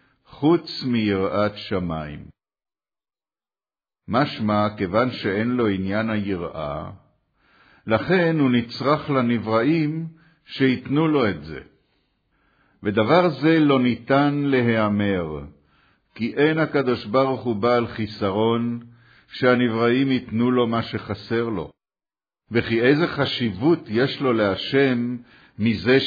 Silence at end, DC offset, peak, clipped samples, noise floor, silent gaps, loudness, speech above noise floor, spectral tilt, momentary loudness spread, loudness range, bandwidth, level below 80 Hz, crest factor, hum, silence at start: 0 s; under 0.1%; -4 dBFS; under 0.1%; under -90 dBFS; none; -21 LUFS; over 69 dB; -8.5 dB/octave; 12 LU; 5 LU; 5 kHz; -54 dBFS; 18 dB; none; 0.35 s